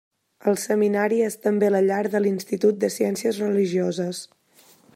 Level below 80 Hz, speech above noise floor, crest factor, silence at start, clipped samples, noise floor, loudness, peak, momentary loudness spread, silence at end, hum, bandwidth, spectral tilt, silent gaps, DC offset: -76 dBFS; 34 dB; 14 dB; 0.45 s; under 0.1%; -56 dBFS; -22 LUFS; -8 dBFS; 6 LU; 0.7 s; none; 16 kHz; -5.5 dB/octave; none; under 0.1%